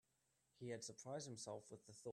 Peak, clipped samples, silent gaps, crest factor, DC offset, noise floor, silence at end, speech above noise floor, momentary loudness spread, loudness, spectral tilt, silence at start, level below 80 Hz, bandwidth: -38 dBFS; under 0.1%; none; 18 dB; under 0.1%; -85 dBFS; 0 s; 32 dB; 6 LU; -53 LUFS; -4 dB/octave; 0.55 s; -88 dBFS; 13 kHz